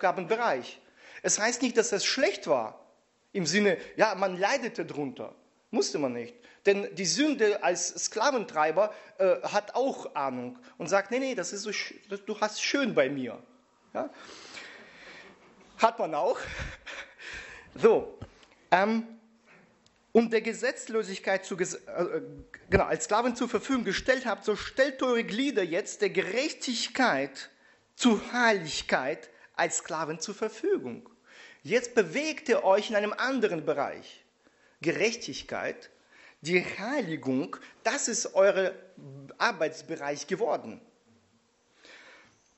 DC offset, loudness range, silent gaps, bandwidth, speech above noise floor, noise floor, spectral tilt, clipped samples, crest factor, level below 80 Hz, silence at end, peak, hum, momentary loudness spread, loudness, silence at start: under 0.1%; 5 LU; none; 8.2 kHz; 39 dB; -68 dBFS; -3 dB/octave; under 0.1%; 24 dB; -58 dBFS; 0.45 s; -6 dBFS; none; 16 LU; -29 LUFS; 0 s